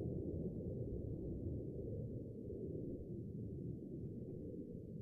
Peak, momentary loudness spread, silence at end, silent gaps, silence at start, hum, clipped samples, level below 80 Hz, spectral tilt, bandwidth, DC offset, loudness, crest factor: -32 dBFS; 4 LU; 0 s; none; 0 s; none; under 0.1%; -56 dBFS; -13 dB/octave; 1.1 kHz; under 0.1%; -47 LUFS; 14 dB